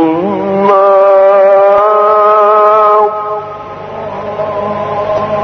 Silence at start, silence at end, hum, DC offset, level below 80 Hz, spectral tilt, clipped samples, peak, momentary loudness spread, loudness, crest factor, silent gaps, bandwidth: 0 s; 0 s; none; under 0.1%; -48 dBFS; -7.5 dB/octave; under 0.1%; 0 dBFS; 14 LU; -8 LUFS; 8 dB; none; 6.2 kHz